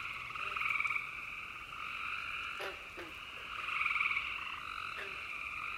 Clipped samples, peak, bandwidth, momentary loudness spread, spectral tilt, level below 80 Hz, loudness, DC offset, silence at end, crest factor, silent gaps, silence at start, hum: under 0.1%; -20 dBFS; 16 kHz; 11 LU; -2 dB/octave; -64 dBFS; -37 LUFS; under 0.1%; 0 s; 20 dB; none; 0 s; none